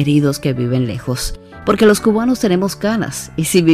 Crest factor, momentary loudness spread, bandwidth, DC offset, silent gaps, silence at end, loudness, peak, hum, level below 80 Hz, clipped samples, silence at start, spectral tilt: 14 dB; 10 LU; 16 kHz; under 0.1%; none; 0 s; -16 LUFS; -2 dBFS; none; -36 dBFS; under 0.1%; 0 s; -5.5 dB/octave